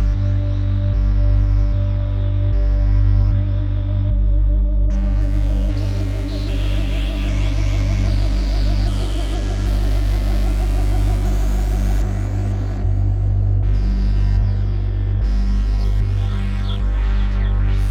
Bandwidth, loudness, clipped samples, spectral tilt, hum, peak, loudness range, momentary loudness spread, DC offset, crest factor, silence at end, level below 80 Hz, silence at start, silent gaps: 7.6 kHz; -20 LUFS; under 0.1%; -7.5 dB/octave; 50 Hz at -20 dBFS; -6 dBFS; 2 LU; 4 LU; under 0.1%; 10 dB; 0 s; -18 dBFS; 0 s; none